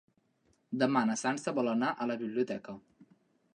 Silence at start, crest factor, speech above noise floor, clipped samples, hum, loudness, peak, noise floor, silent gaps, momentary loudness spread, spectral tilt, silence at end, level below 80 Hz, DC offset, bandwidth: 0.7 s; 20 dB; 41 dB; under 0.1%; none; -32 LUFS; -14 dBFS; -73 dBFS; none; 12 LU; -5 dB/octave; 0.5 s; -80 dBFS; under 0.1%; 10.5 kHz